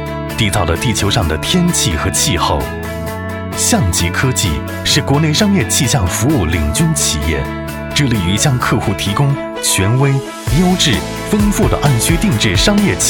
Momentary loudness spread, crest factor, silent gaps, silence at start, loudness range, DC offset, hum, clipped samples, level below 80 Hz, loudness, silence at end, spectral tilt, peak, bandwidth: 6 LU; 14 dB; none; 0 s; 2 LU; under 0.1%; none; under 0.1%; -26 dBFS; -14 LUFS; 0 s; -4 dB/octave; 0 dBFS; 19 kHz